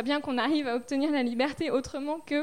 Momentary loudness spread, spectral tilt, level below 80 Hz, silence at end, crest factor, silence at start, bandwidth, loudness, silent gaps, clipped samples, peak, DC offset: 4 LU; -4.5 dB/octave; -60 dBFS; 0 s; 14 dB; 0 s; 11.5 kHz; -29 LUFS; none; under 0.1%; -14 dBFS; 0.2%